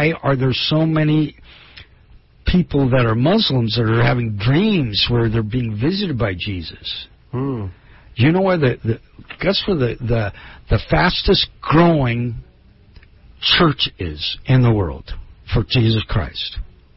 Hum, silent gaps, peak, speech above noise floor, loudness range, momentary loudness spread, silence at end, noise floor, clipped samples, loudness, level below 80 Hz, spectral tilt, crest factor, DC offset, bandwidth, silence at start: none; none; -2 dBFS; 31 dB; 4 LU; 13 LU; 0.3 s; -48 dBFS; under 0.1%; -18 LUFS; -32 dBFS; -10 dB/octave; 16 dB; under 0.1%; 5.8 kHz; 0 s